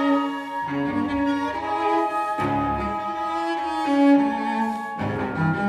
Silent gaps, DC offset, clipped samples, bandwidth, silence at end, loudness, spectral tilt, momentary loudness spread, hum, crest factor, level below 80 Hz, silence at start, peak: none; under 0.1%; under 0.1%; 11.5 kHz; 0 s; -23 LUFS; -7 dB/octave; 8 LU; none; 16 dB; -48 dBFS; 0 s; -6 dBFS